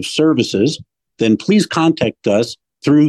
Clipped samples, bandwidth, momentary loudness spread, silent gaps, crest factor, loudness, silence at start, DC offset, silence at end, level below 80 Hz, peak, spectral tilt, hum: under 0.1%; 12.5 kHz; 8 LU; none; 12 dB; -16 LUFS; 0 s; under 0.1%; 0 s; -56 dBFS; -4 dBFS; -5.5 dB/octave; none